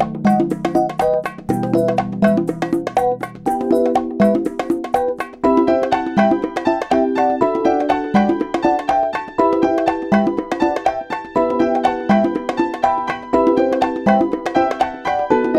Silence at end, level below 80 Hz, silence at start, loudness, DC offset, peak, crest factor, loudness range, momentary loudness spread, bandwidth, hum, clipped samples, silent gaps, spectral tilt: 0 s; -48 dBFS; 0 s; -17 LUFS; under 0.1%; 0 dBFS; 16 dB; 1 LU; 5 LU; 13.5 kHz; none; under 0.1%; none; -7 dB/octave